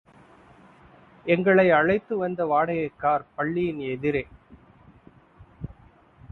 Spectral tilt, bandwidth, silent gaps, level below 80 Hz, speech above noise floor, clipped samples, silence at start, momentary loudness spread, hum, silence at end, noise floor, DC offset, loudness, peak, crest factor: -9 dB/octave; 4.3 kHz; none; -56 dBFS; 31 dB; under 0.1%; 1.25 s; 23 LU; none; 0.6 s; -54 dBFS; under 0.1%; -23 LUFS; -6 dBFS; 20 dB